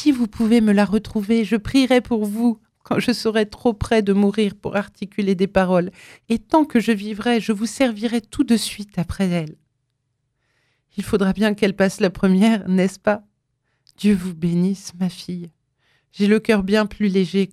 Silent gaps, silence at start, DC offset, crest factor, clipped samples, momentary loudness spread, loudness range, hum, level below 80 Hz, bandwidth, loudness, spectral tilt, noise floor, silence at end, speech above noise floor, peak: none; 0 s; under 0.1%; 18 dB; under 0.1%; 9 LU; 4 LU; none; -46 dBFS; 14 kHz; -20 LUFS; -6 dB/octave; -73 dBFS; 0.05 s; 54 dB; -2 dBFS